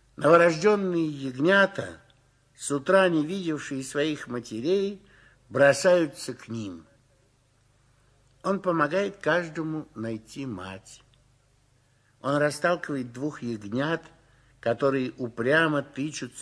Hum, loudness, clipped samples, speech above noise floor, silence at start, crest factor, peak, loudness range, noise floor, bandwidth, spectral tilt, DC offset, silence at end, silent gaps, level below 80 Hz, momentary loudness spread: 50 Hz at -65 dBFS; -26 LUFS; under 0.1%; 39 dB; 0.2 s; 20 dB; -6 dBFS; 6 LU; -64 dBFS; 11 kHz; -5 dB/octave; under 0.1%; 0 s; none; -66 dBFS; 15 LU